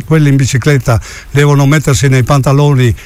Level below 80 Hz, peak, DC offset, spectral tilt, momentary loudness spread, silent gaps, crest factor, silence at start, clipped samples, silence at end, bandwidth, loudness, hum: -30 dBFS; 0 dBFS; under 0.1%; -6 dB/octave; 4 LU; none; 8 dB; 0 s; under 0.1%; 0 s; 15 kHz; -9 LUFS; none